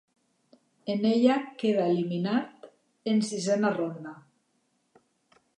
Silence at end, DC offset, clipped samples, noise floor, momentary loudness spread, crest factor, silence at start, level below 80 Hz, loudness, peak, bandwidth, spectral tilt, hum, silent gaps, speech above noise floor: 1.45 s; under 0.1%; under 0.1%; -73 dBFS; 16 LU; 20 dB; 0.85 s; -82 dBFS; -27 LUFS; -10 dBFS; 11 kHz; -6 dB/octave; none; none; 47 dB